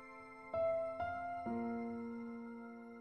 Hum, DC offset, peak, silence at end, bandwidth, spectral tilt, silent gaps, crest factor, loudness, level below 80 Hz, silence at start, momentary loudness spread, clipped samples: none; under 0.1%; -30 dBFS; 0 s; 8.8 kHz; -8 dB/octave; none; 12 dB; -42 LUFS; -72 dBFS; 0 s; 14 LU; under 0.1%